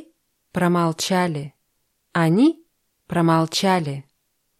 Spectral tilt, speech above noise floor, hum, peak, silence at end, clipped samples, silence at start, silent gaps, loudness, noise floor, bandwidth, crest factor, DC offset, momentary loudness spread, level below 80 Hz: -5.5 dB/octave; 51 dB; none; -8 dBFS; 0.6 s; under 0.1%; 0.55 s; none; -21 LUFS; -71 dBFS; 14 kHz; 14 dB; under 0.1%; 14 LU; -62 dBFS